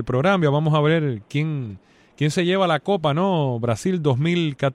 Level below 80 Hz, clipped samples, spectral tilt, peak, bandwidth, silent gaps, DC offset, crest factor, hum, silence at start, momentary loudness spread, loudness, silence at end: -54 dBFS; under 0.1%; -6.5 dB/octave; -6 dBFS; 11.5 kHz; none; under 0.1%; 14 dB; none; 0 s; 7 LU; -21 LUFS; 0 s